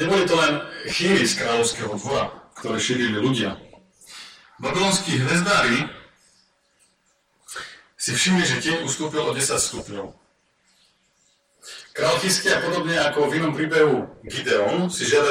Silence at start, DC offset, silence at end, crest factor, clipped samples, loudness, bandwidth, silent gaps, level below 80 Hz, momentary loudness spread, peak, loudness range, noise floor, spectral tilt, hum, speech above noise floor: 0 s; under 0.1%; 0 s; 20 dB; under 0.1%; -21 LUFS; 16.5 kHz; none; -56 dBFS; 17 LU; -4 dBFS; 4 LU; -66 dBFS; -3.5 dB/octave; none; 44 dB